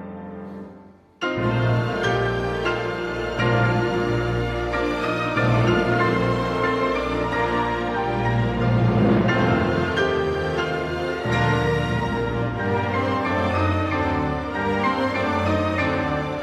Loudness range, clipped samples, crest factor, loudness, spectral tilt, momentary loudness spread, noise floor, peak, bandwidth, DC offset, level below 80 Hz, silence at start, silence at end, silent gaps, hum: 2 LU; under 0.1%; 14 dB; -22 LUFS; -7 dB/octave; 6 LU; -47 dBFS; -8 dBFS; 10 kHz; under 0.1%; -40 dBFS; 0 s; 0 s; none; none